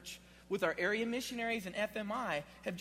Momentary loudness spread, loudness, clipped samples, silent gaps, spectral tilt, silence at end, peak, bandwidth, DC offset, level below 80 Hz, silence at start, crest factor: 9 LU; -37 LUFS; under 0.1%; none; -4 dB/octave; 0 s; -18 dBFS; 16 kHz; under 0.1%; -66 dBFS; 0 s; 20 dB